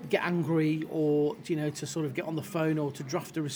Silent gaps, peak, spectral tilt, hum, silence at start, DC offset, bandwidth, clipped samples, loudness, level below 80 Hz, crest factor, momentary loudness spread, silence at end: none; -12 dBFS; -6 dB/octave; none; 0 s; under 0.1%; over 20 kHz; under 0.1%; -30 LUFS; -72 dBFS; 18 dB; 6 LU; 0 s